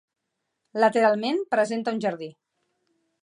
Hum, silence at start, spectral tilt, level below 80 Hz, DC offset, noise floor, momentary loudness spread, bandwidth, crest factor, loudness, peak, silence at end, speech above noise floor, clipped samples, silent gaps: none; 0.75 s; -5 dB/octave; -82 dBFS; under 0.1%; -79 dBFS; 16 LU; 10.5 kHz; 20 dB; -24 LUFS; -6 dBFS; 0.9 s; 56 dB; under 0.1%; none